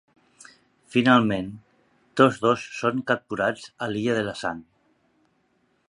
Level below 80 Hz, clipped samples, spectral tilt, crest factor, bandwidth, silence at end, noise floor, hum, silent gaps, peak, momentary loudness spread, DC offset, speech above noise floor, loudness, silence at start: -62 dBFS; under 0.1%; -6 dB/octave; 22 dB; 11 kHz; 1.3 s; -68 dBFS; none; none; -2 dBFS; 13 LU; under 0.1%; 45 dB; -24 LUFS; 0.9 s